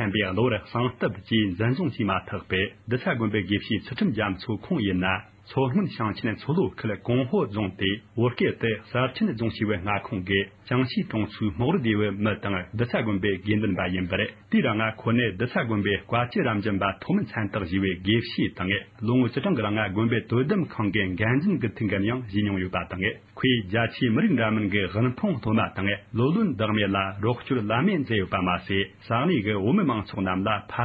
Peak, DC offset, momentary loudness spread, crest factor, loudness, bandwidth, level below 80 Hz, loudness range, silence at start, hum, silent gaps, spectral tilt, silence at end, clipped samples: -8 dBFS; under 0.1%; 5 LU; 18 dB; -26 LUFS; 5.2 kHz; -48 dBFS; 2 LU; 0 s; none; none; -9.5 dB/octave; 0 s; under 0.1%